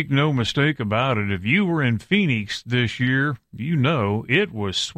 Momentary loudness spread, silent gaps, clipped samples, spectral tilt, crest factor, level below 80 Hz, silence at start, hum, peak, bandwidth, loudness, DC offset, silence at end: 4 LU; none; under 0.1%; -6 dB/octave; 18 dB; -52 dBFS; 0 s; none; -2 dBFS; 10.5 kHz; -21 LUFS; under 0.1%; 0.05 s